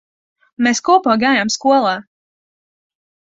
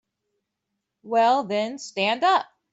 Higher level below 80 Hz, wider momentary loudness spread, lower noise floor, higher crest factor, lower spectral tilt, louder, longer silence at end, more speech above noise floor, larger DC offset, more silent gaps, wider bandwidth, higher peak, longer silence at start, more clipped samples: first, -62 dBFS vs -78 dBFS; about the same, 6 LU vs 7 LU; first, under -90 dBFS vs -81 dBFS; about the same, 16 dB vs 16 dB; about the same, -3 dB/octave vs -3.5 dB/octave; first, -15 LUFS vs -23 LUFS; first, 1.25 s vs 0.3 s; first, over 76 dB vs 59 dB; neither; neither; about the same, 8 kHz vs 8 kHz; first, -2 dBFS vs -8 dBFS; second, 0.6 s vs 1.05 s; neither